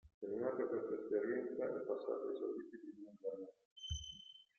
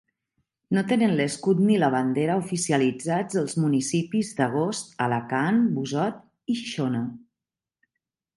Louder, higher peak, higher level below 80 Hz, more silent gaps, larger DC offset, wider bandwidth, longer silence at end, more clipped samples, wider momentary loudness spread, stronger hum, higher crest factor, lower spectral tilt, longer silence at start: second, -43 LUFS vs -25 LUFS; second, -26 dBFS vs -8 dBFS; about the same, -64 dBFS vs -68 dBFS; first, 0.14-0.21 s, 3.65-3.76 s vs none; neither; second, 6.6 kHz vs 11.5 kHz; second, 0.15 s vs 1.2 s; neither; first, 13 LU vs 7 LU; neither; about the same, 18 dB vs 16 dB; about the same, -4.5 dB/octave vs -5.5 dB/octave; second, 0.05 s vs 0.7 s